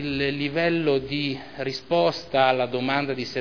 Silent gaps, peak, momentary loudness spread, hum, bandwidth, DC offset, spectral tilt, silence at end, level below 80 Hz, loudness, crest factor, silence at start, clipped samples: none; -4 dBFS; 8 LU; none; 5.4 kHz; 0.4%; -6 dB/octave; 0 s; -54 dBFS; -24 LUFS; 20 dB; 0 s; under 0.1%